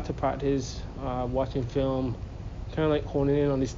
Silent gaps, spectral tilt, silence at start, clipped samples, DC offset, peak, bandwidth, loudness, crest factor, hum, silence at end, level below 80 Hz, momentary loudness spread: none; -7 dB/octave; 0 s; under 0.1%; under 0.1%; -12 dBFS; 7.4 kHz; -29 LUFS; 16 dB; none; 0 s; -40 dBFS; 11 LU